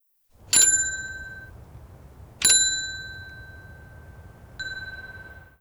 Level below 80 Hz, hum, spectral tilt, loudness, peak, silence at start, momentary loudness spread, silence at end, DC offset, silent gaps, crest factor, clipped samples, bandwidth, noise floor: -50 dBFS; none; 1 dB/octave; -20 LUFS; -6 dBFS; 0.5 s; 26 LU; 0.2 s; under 0.1%; none; 22 dB; under 0.1%; over 20 kHz; -54 dBFS